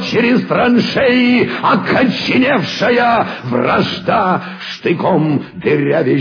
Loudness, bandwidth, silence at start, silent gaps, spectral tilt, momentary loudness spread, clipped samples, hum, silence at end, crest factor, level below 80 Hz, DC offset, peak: -13 LUFS; 5.4 kHz; 0 s; none; -6.5 dB/octave; 6 LU; under 0.1%; none; 0 s; 12 dB; -50 dBFS; under 0.1%; -2 dBFS